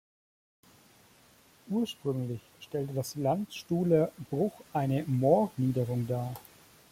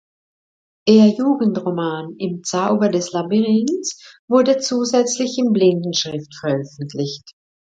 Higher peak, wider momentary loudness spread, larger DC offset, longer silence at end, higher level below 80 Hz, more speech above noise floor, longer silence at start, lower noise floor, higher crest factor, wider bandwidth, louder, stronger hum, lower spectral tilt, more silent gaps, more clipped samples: second, -12 dBFS vs 0 dBFS; about the same, 11 LU vs 11 LU; neither; first, 0.5 s vs 0.35 s; about the same, -66 dBFS vs -66 dBFS; second, 31 dB vs over 72 dB; first, 1.65 s vs 0.85 s; second, -61 dBFS vs under -90 dBFS; about the same, 20 dB vs 18 dB; first, 16.5 kHz vs 9 kHz; second, -31 LUFS vs -18 LUFS; neither; first, -7.5 dB/octave vs -5 dB/octave; second, none vs 4.19-4.28 s; neither